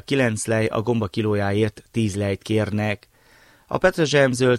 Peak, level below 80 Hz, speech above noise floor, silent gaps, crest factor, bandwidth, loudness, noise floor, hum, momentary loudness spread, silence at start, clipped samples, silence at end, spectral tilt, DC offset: -4 dBFS; -50 dBFS; 33 dB; none; 18 dB; 15 kHz; -22 LUFS; -54 dBFS; none; 7 LU; 0.1 s; under 0.1%; 0 s; -5.5 dB/octave; under 0.1%